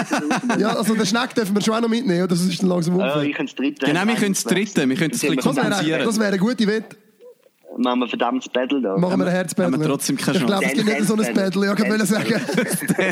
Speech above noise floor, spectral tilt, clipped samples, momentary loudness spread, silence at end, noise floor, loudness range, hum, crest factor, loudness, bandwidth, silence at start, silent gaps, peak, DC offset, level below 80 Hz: 29 dB; -5 dB/octave; under 0.1%; 3 LU; 0 s; -48 dBFS; 2 LU; none; 14 dB; -20 LUFS; 16 kHz; 0 s; none; -4 dBFS; under 0.1%; -66 dBFS